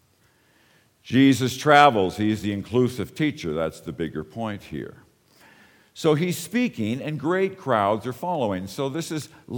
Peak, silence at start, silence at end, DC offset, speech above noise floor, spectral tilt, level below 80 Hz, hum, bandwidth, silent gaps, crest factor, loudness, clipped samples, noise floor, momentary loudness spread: 0 dBFS; 1.05 s; 0 s; under 0.1%; 39 dB; -5.5 dB/octave; -58 dBFS; none; 19 kHz; none; 24 dB; -23 LUFS; under 0.1%; -62 dBFS; 14 LU